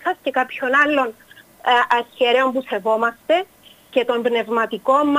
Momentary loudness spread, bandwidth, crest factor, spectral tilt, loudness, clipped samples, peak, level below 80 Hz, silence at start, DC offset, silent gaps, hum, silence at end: 7 LU; 15.5 kHz; 16 dB; -4 dB/octave; -19 LUFS; under 0.1%; -4 dBFS; -66 dBFS; 0 s; under 0.1%; none; none; 0 s